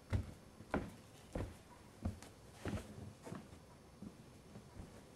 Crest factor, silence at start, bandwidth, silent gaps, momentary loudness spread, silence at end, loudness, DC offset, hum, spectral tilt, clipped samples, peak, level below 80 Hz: 28 dB; 0 s; 15.5 kHz; none; 15 LU; 0 s; -50 LUFS; under 0.1%; none; -6.5 dB/octave; under 0.1%; -22 dBFS; -58 dBFS